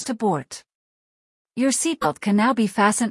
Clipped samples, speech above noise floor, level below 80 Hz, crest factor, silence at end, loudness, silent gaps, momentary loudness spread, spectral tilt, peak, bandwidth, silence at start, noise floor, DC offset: under 0.1%; over 69 dB; -64 dBFS; 18 dB; 0 s; -21 LUFS; 0.75-1.45 s; 16 LU; -4 dB/octave; -4 dBFS; 12 kHz; 0 s; under -90 dBFS; under 0.1%